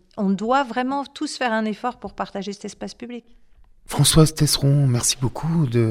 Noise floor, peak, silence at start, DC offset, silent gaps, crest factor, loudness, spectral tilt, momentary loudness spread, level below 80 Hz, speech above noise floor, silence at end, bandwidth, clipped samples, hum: -40 dBFS; -2 dBFS; 0.15 s; under 0.1%; none; 18 dB; -21 LUFS; -4.5 dB/octave; 17 LU; -40 dBFS; 20 dB; 0 s; 16 kHz; under 0.1%; none